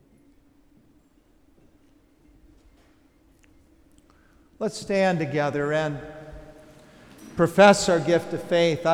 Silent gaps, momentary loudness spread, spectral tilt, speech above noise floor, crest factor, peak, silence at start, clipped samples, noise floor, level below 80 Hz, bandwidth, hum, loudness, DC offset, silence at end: none; 23 LU; -5 dB/octave; 38 dB; 22 dB; -4 dBFS; 4.6 s; under 0.1%; -60 dBFS; -56 dBFS; 15 kHz; none; -22 LUFS; under 0.1%; 0 s